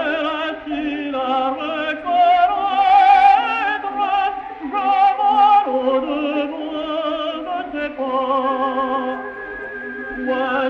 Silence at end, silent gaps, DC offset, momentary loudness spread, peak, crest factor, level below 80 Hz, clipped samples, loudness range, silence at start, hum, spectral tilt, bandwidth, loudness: 0 s; none; under 0.1%; 13 LU; -2 dBFS; 16 dB; -54 dBFS; under 0.1%; 7 LU; 0 s; none; -4.5 dB/octave; 6.2 kHz; -18 LUFS